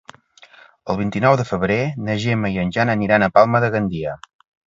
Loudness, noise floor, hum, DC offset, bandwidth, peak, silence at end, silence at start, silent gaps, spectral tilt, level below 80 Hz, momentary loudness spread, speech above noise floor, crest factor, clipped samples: -18 LUFS; -49 dBFS; none; under 0.1%; 7.8 kHz; 0 dBFS; 0.5 s; 0.85 s; none; -7 dB/octave; -48 dBFS; 12 LU; 31 dB; 20 dB; under 0.1%